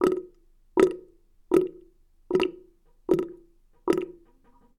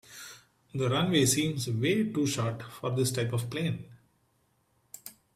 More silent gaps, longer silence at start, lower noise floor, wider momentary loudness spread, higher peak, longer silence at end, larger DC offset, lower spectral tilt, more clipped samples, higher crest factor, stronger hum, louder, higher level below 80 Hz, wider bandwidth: neither; about the same, 0 s vs 0.1 s; second, -59 dBFS vs -71 dBFS; second, 16 LU vs 21 LU; first, -4 dBFS vs -10 dBFS; first, 0.65 s vs 0.25 s; neither; first, -6 dB/octave vs -4.5 dB/octave; neither; about the same, 24 dB vs 20 dB; neither; about the same, -27 LUFS vs -29 LUFS; first, -56 dBFS vs -64 dBFS; second, 13.5 kHz vs 16 kHz